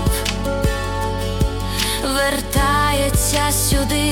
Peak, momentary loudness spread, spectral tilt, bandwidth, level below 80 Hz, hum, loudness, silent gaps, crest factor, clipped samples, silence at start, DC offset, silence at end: -4 dBFS; 6 LU; -3.5 dB/octave; 18 kHz; -24 dBFS; none; -18 LUFS; none; 14 dB; under 0.1%; 0 s; under 0.1%; 0 s